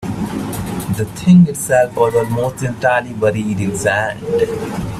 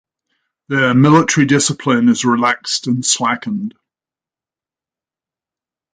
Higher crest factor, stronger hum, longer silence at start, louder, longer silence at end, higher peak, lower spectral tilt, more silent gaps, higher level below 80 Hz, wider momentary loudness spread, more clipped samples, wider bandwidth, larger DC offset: about the same, 14 dB vs 16 dB; neither; second, 0 s vs 0.7 s; about the same, -16 LUFS vs -14 LUFS; second, 0 s vs 2.25 s; about the same, 0 dBFS vs 0 dBFS; first, -6.5 dB/octave vs -4 dB/octave; neither; first, -42 dBFS vs -58 dBFS; about the same, 12 LU vs 10 LU; neither; first, 14.5 kHz vs 9.6 kHz; neither